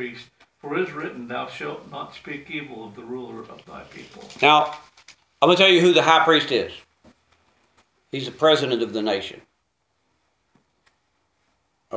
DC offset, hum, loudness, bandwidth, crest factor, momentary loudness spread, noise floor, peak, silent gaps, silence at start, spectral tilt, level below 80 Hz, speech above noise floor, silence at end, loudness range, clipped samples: under 0.1%; none; -20 LUFS; 8 kHz; 24 dB; 25 LU; -72 dBFS; 0 dBFS; none; 0 s; -4.5 dB/octave; -66 dBFS; 51 dB; 0 s; 14 LU; under 0.1%